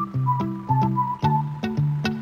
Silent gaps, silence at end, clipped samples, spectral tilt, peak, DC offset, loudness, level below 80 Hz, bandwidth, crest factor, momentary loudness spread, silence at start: none; 0 s; under 0.1%; -8 dB/octave; -8 dBFS; under 0.1%; -24 LUFS; -52 dBFS; 6.8 kHz; 14 dB; 3 LU; 0 s